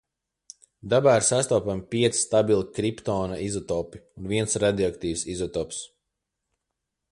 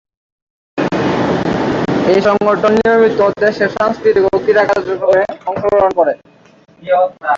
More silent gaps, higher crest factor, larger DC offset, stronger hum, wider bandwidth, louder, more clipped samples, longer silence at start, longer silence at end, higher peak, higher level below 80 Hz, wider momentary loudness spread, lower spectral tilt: neither; first, 20 dB vs 12 dB; neither; neither; first, 11.5 kHz vs 7.6 kHz; second, -25 LUFS vs -13 LUFS; neither; about the same, 0.85 s vs 0.75 s; first, 1.25 s vs 0 s; second, -6 dBFS vs 0 dBFS; second, -52 dBFS vs -44 dBFS; first, 13 LU vs 7 LU; second, -4.5 dB/octave vs -6.5 dB/octave